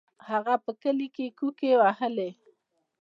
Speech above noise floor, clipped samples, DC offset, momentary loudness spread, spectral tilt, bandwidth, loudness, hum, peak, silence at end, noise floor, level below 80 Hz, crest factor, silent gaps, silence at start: 42 dB; under 0.1%; under 0.1%; 11 LU; -7 dB/octave; 6 kHz; -27 LUFS; none; -10 dBFS; 0.7 s; -69 dBFS; -88 dBFS; 18 dB; none; 0.25 s